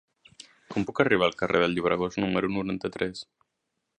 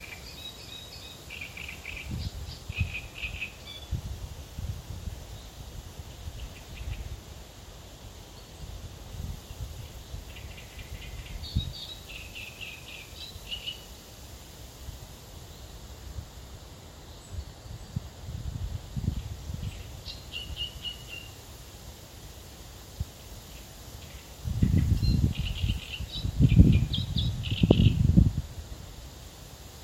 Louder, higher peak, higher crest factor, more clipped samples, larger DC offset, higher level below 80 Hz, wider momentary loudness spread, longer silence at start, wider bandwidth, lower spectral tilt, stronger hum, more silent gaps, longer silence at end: first, -27 LUFS vs -32 LUFS; second, -6 dBFS vs -2 dBFS; second, 22 dB vs 30 dB; neither; neither; second, -58 dBFS vs -38 dBFS; second, 9 LU vs 20 LU; first, 0.7 s vs 0 s; second, 10 kHz vs 16.5 kHz; about the same, -6 dB/octave vs -6 dB/octave; neither; neither; first, 0.75 s vs 0 s